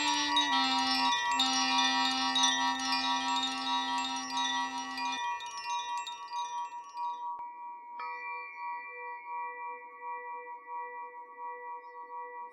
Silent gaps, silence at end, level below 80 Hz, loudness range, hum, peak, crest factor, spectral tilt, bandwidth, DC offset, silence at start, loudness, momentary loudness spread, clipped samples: none; 0 s; -72 dBFS; 14 LU; none; -14 dBFS; 20 dB; 0.5 dB/octave; 15 kHz; under 0.1%; 0 s; -31 LUFS; 17 LU; under 0.1%